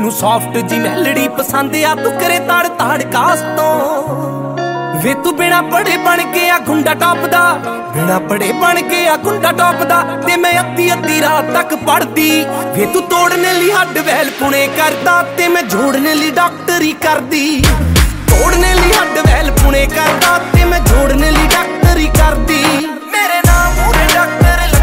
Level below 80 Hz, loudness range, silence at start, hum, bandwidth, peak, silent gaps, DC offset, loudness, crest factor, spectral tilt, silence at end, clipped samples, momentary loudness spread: -18 dBFS; 3 LU; 0 s; none; 16.5 kHz; 0 dBFS; none; under 0.1%; -11 LUFS; 12 dB; -4 dB/octave; 0 s; under 0.1%; 5 LU